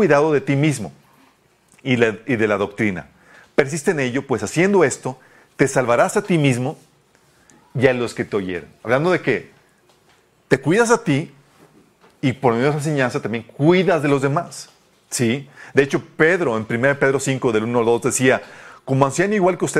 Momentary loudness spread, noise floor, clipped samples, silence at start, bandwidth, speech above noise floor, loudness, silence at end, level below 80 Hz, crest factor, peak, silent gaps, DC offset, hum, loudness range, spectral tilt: 11 LU; -57 dBFS; under 0.1%; 0 s; 15 kHz; 38 dB; -19 LUFS; 0 s; -56 dBFS; 20 dB; 0 dBFS; none; under 0.1%; none; 3 LU; -5.5 dB/octave